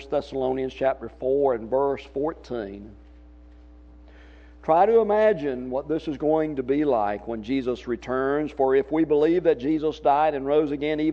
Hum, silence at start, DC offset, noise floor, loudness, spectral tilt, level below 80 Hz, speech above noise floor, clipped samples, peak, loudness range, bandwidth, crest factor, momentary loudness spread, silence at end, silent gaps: none; 0 s; under 0.1%; -48 dBFS; -24 LUFS; -7.5 dB/octave; -50 dBFS; 24 dB; under 0.1%; -6 dBFS; 6 LU; 7 kHz; 18 dB; 9 LU; 0 s; none